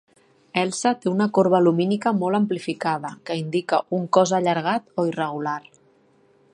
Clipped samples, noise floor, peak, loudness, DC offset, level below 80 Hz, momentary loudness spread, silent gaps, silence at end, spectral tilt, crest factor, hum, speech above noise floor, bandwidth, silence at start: under 0.1%; -59 dBFS; -2 dBFS; -22 LUFS; under 0.1%; -72 dBFS; 10 LU; none; 0.95 s; -5.5 dB/octave; 20 dB; none; 37 dB; 11 kHz; 0.55 s